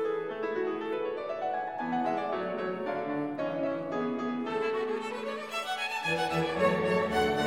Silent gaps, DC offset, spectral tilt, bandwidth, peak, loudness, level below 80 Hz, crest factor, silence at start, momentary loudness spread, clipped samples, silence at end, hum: none; under 0.1%; -5.5 dB/octave; 16.5 kHz; -14 dBFS; -31 LUFS; -62 dBFS; 18 dB; 0 s; 6 LU; under 0.1%; 0 s; none